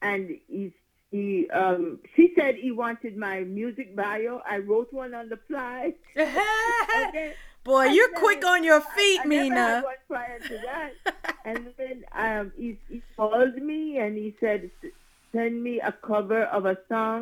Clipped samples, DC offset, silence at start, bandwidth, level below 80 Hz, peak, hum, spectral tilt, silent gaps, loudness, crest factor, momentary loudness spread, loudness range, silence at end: under 0.1%; under 0.1%; 0 s; 18.5 kHz; -54 dBFS; -4 dBFS; none; -4 dB/octave; none; -25 LUFS; 22 dB; 16 LU; 9 LU; 0 s